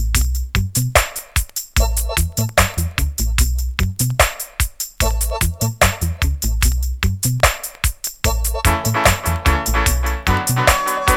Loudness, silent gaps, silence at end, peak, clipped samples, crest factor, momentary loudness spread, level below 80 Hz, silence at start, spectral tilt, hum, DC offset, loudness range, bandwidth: -18 LUFS; none; 0 s; 0 dBFS; under 0.1%; 18 dB; 6 LU; -22 dBFS; 0 s; -3.5 dB/octave; none; under 0.1%; 2 LU; over 20 kHz